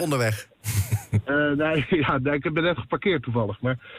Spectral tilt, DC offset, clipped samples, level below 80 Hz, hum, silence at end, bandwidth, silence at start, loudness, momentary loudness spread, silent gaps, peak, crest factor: -6 dB/octave; under 0.1%; under 0.1%; -50 dBFS; none; 0 s; 16 kHz; 0 s; -24 LUFS; 5 LU; none; -10 dBFS; 14 dB